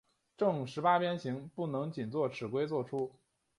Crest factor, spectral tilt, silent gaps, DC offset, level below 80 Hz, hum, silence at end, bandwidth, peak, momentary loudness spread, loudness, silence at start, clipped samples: 20 dB; -7 dB/octave; none; under 0.1%; -76 dBFS; none; 0.5 s; 11.5 kHz; -16 dBFS; 9 LU; -35 LUFS; 0.4 s; under 0.1%